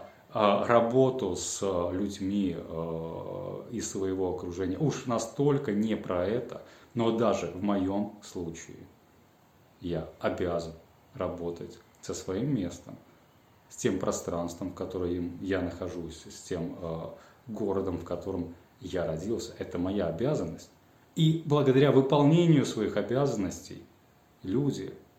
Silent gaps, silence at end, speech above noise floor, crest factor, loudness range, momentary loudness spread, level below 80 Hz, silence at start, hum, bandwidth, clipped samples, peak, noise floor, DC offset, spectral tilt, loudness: none; 0.2 s; 32 dB; 22 dB; 10 LU; 18 LU; -62 dBFS; 0 s; none; 16 kHz; under 0.1%; -8 dBFS; -61 dBFS; under 0.1%; -6 dB/octave; -30 LUFS